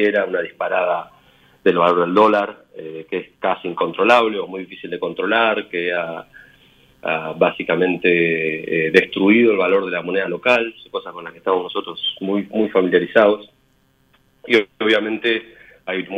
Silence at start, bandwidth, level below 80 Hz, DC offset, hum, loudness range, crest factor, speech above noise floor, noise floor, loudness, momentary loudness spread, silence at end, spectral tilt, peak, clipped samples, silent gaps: 0 s; 9.4 kHz; -62 dBFS; under 0.1%; none; 4 LU; 20 dB; 41 dB; -59 dBFS; -18 LUFS; 14 LU; 0 s; -6 dB/octave; 0 dBFS; under 0.1%; none